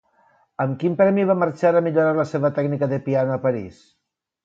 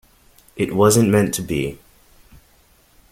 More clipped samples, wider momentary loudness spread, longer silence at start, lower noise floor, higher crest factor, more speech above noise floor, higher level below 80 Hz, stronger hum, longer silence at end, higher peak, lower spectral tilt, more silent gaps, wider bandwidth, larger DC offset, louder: neither; about the same, 9 LU vs 11 LU; about the same, 0.6 s vs 0.55 s; first, -60 dBFS vs -55 dBFS; about the same, 16 dB vs 18 dB; about the same, 40 dB vs 38 dB; second, -62 dBFS vs -48 dBFS; neither; second, 0.7 s vs 1.35 s; second, -6 dBFS vs -2 dBFS; first, -9 dB/octave vs -5.5 dB/octave; neither; second, 7.8 kHz vs 16.5 kHz; neither; about the same, -20 LUFS vs -18 LUFS